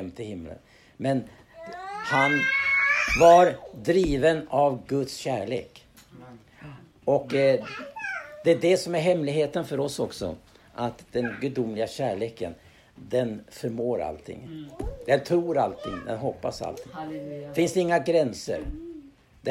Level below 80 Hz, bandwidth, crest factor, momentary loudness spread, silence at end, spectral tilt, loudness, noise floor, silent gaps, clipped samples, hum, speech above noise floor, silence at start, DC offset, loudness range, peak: -48 dBFS; 15.5 kHz; 22 dB; 18 LU; 0 s; -5.5 dB/octave; -25 LUFS; -49 dBFS; none; under 0.1%; none; 24 dB; 0 s; under 0.1%; 10 LU; -4 dBFS